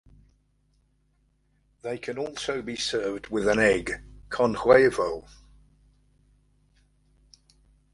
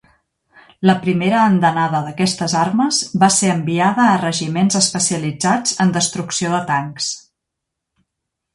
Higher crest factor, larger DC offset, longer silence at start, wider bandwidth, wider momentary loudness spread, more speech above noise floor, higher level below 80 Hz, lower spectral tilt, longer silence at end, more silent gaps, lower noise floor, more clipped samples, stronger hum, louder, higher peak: first, 24 dB vs 18 dB; neither; first, 1.85 s vs 0.8 s; about the same, 11.5 kHz vs 11.5 kHz; first, 17 LU vs 6 LU; second, 43 dB vs 63 dB; about the same, -52 dBFS vs -56 dBFS; about the same, -4.5 dB/octave vs -4 dB/octave; first, 2.7 s vs 1.35 s; neither; second, -68 dBFS vs -79 dBFS; neither; neither; second, -25 LUFS vs -16 LUFS; second, -4 dBFS vs 0 dBFS